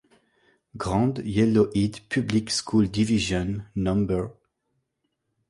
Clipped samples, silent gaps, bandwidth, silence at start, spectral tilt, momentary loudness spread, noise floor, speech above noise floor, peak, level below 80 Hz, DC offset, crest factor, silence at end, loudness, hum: under 0.1%; none; 11.5 kHz; 0.75 s; -6 dB/octave; 7 LU; -77 dBFS; 54 dB; -8 dBFS; -46 dBFS; under 0.1%; 16 dB; 1.2 s; -24 LUFS; none